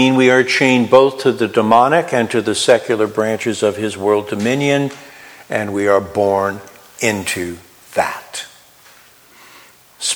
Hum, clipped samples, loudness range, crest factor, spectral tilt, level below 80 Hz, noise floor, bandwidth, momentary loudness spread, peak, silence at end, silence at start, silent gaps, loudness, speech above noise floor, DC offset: none; under 0.1%; 9 LU; 16 dB; -4 dB/octave; -58 dBFS; -46 dBFS; over 20 kHz; 13 LU; 0 dBFS; 0 s; 0 s; none; -15 LUFS; 31 dB; under 0.1%